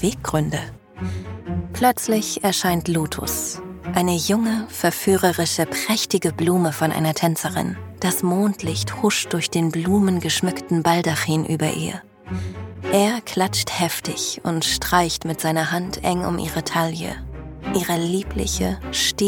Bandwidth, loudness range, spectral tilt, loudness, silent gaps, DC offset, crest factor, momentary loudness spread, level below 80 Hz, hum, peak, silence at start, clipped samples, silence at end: 19 kHz; 2 LU; -4 dB/octave; -21 LUFS; none; under 0.1%; 20 dB; 10 LU; -42 dBFS; none; -2 dBFS; 0 s; under 0.1%; 0 s